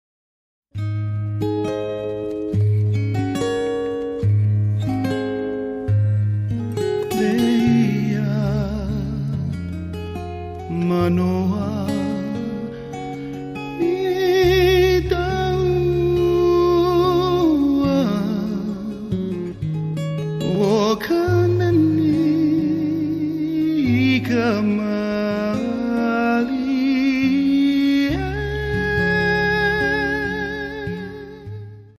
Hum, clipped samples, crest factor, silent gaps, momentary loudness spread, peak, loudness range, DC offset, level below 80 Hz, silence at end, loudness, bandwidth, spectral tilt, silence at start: none; under 0.1%; 14 dB; none; 11 LU; -6 dBFS; 5 LU; under 0.1%; -38 dBFS; 0.1 s; -20 LUFS; 15 kHz; -7.5 dB/octave; 0.75 s